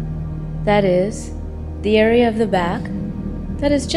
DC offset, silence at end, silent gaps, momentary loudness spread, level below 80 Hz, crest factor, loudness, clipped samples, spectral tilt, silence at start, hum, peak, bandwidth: under 0.1%; 0 s; none; 14 LU; -32 dBFS; 16 dB; -19 LUFS; under 0.1%; -6 dB/octave; 0 s; none; -2 dBFS; 12 kHz